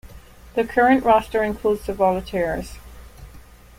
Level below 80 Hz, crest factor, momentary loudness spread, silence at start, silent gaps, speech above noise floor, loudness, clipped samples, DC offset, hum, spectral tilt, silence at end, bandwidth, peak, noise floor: -42 dBFS; 18 dB; 11 LU; 0.05 s; none; 25 dB; -20 LUFS; under 0.1%; under 0.1%; none; -6 dB/octave; 0.4 s; 16.5 kHz; -4 dBFS; -44 dBFS